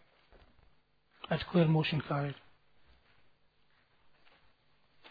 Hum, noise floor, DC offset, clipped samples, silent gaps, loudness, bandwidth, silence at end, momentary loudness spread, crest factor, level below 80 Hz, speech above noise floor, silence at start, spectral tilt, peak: none; -69 dBFS; under 0.1%; under 0.1%; none; -32 LUFS; 5 kHz; 2.75 s; 19 LU; 20 dB; -64 dBFS; 39 dB; 1.3 s; -9.5 dB/octave; -16 dBFS